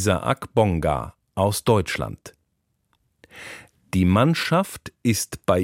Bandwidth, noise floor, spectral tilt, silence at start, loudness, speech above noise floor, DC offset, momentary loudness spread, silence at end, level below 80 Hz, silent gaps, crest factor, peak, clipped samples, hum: 16.5 kHz; -72 dBFS; -5.5 dB/octave; 0 s; -22 LUFS; 51 dB; under 0.1%; 19 LU; 0 s; -44 dBFS; none; 20 dB; -4 dBFS; under 0.1%; none